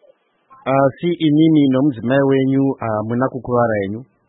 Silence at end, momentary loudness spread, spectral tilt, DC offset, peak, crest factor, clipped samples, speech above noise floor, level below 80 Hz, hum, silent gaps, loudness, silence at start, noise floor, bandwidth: 0.25 s; 8 LU; -12.5 dB/octave; under 0.1%; -4 dBFS; 14 dB; under 0.1%; 39 dB; -54 dBFS; none; none; -17 LUFS; 0.65 s; -55 dBFS; 4 kHz